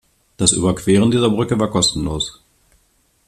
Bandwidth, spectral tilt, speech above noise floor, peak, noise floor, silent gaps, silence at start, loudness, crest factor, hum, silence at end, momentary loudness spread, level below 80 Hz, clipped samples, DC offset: 14 kHz; -4.5 dB/octave; 44 dB; 0 dBFS; -60 dBFS; none; 0.4 s; -17 LUFS; 18 dB; none; 0.95 s; 8 LU; -40 dBFS; under 0.1%; under 0.1%